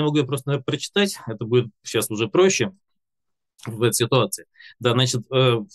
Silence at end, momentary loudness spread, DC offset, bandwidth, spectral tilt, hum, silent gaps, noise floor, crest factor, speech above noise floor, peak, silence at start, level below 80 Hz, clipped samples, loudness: 0.1 s; 9 LU; under 0.1%; 13 kHz; -4.5 dB/octave; none; none; -84 dBFS; 18 dB; 63 dB; -4 dBFS; 0 s; -64 dBFS; under 0.1%; -22 LUFS